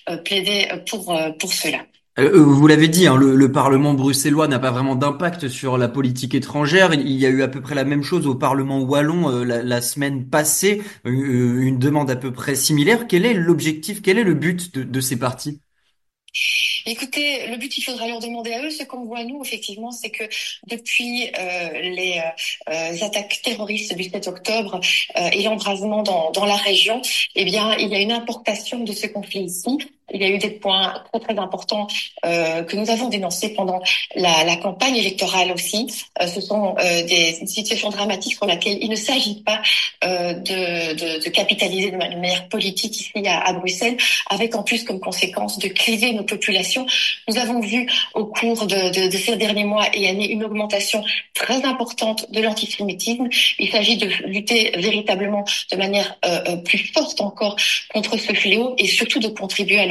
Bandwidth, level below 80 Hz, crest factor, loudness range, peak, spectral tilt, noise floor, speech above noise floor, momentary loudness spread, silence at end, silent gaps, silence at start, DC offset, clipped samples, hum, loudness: 12.5 kHz; -64 dBFS; 20 dB; 6 LU; 0 dBFS; -3.5 dB/octave; -69 dBFS; 50 dB; 9 LU; 0 s; none; 0.05 s; under 0.1%; under 0.1%; none; -19 LUFS